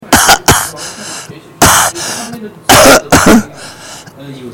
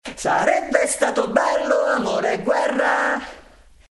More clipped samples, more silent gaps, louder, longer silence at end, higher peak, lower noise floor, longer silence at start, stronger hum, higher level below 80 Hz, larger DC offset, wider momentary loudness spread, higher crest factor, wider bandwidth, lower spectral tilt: first, 1% vs under 0.1%; neither; first, -7 LUFS vs -20 LUFS; second, 0 s vs 0.5 s; about the same, 0 dBFS vs -2 dBFS; second, -30 dBFS vs -48 dBFS; about the same, 0.1 s vs 0.05 s; neither; first, -30 dBFS vs -52 dBFS; neither; first, 23 LU vs 3 LU; second, 10 dB vs 18 dB; first, over 20 kHz vs 11.5 kHz; about the same, -2.5 dB/octave vs -3 dB/octave